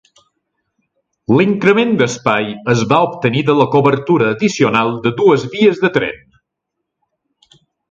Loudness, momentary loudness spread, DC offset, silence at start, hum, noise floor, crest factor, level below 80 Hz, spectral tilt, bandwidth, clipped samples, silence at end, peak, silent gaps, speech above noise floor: -14 LUFS; 5 LU; under 0.1%; 1.3 s; none; -77 dBFS; 14 dB; -54 dBFS; -6 dB/octave; 7.8 kHz; under 0.1%; 1.75 s; 0 dBFS; none; 63 dB